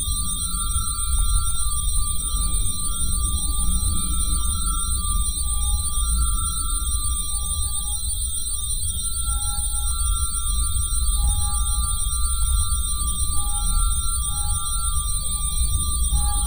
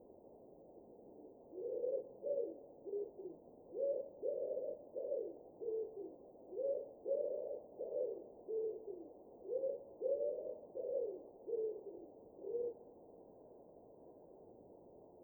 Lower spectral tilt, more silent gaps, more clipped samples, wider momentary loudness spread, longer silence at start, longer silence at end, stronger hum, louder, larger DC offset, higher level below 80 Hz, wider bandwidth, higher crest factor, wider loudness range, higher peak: second, -2 dB/octave vs -10.5 dB/octave; neither; neither; second, 2 LU vs 20 LU; about the same, 0 s vs 0 s; about the same, 0 s vs 0 s; neither; first, -22 LUFS vs -44 LUFS; neither; first, -24 dBFS vs -84 dBFS; about the same, over 20 kHz vs over 20 kHz; about the same, 14 dB vs 16 dB; second, 1 LU vs 4 LU; first, -8 dBFS vs -28 dBFS